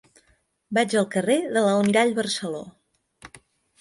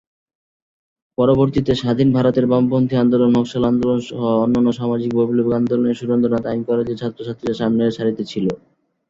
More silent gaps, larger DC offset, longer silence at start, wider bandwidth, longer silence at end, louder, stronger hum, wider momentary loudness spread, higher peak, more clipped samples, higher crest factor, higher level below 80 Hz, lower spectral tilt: neither; neither; second, 0.7 s vs 1.2 s; first, 11.5 kHz vs 7.6 kHz; about the same, 0.45 s vs 0.55 s; second, -22 LUFS vs -18 LUFS; neither; about the same, 9 LU vs 8 LU; second, -8 dBFS vs -2 dBFS; neither; about the same, 18 dB vs 16 dB; second, -66 dBFS vs -48 dBFS; second, -4.5 dB/octave vs -8 dB/octave